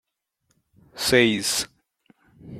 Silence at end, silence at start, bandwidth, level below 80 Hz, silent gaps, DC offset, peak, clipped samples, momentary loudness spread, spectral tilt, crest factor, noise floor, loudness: 0 s; 0.95 s; 16 kHz; -56 dBFS; none; under 0.1%; -4 dBFS; under 0.1%; 10 LU; -3 dB/octave; 22 dB; -73 dBFS; -21 LUFS